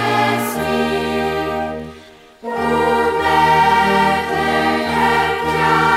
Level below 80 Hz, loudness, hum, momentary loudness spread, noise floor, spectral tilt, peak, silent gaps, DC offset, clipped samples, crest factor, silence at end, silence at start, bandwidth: -40 dBFS; -16 LUFS; none; 10 LU; -41 dBFS; -4.5 dB/octave; -2 dBFS; none; under 0.1%; under 0.1%; 14 dB; 0 s; 0 s; 16 kHz